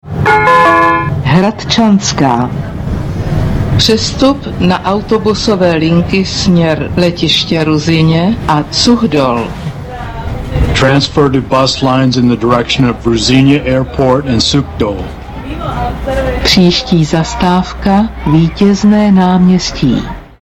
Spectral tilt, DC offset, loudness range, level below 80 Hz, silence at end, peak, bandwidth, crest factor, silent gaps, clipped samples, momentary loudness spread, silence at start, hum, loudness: -5.5 dB/octave; under 0.1%; 2 LU; -26 dBFS; 0.15 s; 0 dBFS; 14.5 kHz; 10 dB; none; under 0.1%; 10 LU; 0.05 s; none; -10 LUFS